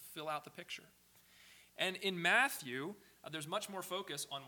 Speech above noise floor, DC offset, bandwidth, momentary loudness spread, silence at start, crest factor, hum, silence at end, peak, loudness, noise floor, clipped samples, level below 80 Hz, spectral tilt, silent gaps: 24 dB; under 0.1%; 19 kHz; 17 LU; 0 s; 24 dB; none; 0 s; -18 dBFS; -38 LUFS; -64 dBFS; under 0.1%; -84 dBFS; -2.5 dB/octave; none